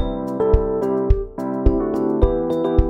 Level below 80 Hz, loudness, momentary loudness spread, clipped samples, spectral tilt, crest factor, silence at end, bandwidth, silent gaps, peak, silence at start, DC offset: -22 dBFS; -20 LUFS; 3 LU; under 0.1%; -10 dB/octave; 16 dB; 0 s; 6 kHz; none; -2 dBFS; 0 s; under 0.1%